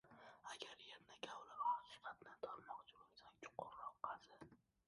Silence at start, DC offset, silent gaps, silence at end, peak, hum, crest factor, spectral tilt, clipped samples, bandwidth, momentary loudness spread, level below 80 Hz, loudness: 0.05 s; under 0.1%; none; 0.3 s; -32 dBFS; none; 22 dB; -2.5 dB/octave; under 0.1%; 11 kHz; 20 LU; -88 dBFS; -52 LUFS